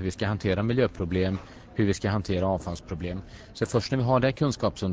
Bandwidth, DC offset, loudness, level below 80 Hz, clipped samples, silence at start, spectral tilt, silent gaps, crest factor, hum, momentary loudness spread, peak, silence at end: 8 kHz; under 0.1%; -27 LUFS; -42 dBFS; under 0.1%; 0 s; -6.5 dB/octave; none; 18 dB; none; 11 LU; -8 dBFS; 0 s